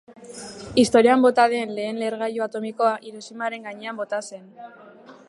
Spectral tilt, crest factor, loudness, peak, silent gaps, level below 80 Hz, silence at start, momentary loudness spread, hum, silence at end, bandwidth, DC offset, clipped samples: -4 dB/octave; 20 dB; -22 LUFS; -4 dBFS; none; -60 dBFS; 0.1 s; 22 LU; none; 0.15 s; 11.5 kHz; under 0.1%; under 0.1%